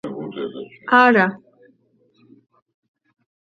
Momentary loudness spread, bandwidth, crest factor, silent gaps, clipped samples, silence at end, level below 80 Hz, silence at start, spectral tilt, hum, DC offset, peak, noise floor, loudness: 18 LU; 7.2 kHz; 22 dB; none; under 0.1%; 2.05 s; -70 dBFS; 0.05 s; -7 dB/octave; none; under 0.1%; 0 dBFS; -61 dBFS; -17 LUFS